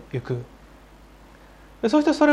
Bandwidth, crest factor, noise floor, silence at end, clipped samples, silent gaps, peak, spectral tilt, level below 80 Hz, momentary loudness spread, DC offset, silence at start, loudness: 11 kHz; 18 dB; -48 dBFS; 0 s; under 0.1%; none; -6 dBFS; -6.5 dB/octave; -52 dBFS; 14 LU; under 0.1%; 0.15 s; -23 LUFS